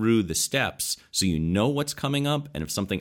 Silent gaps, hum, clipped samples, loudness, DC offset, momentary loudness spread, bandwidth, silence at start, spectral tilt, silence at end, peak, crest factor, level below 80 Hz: none; none; under 0.1%; -25 LUFS; under 0.1%; 6 LU; 17.5 kHz; 0 s; -4 dB/octave; 0 s; -10 dBFS; 16 dB; -48 dBFS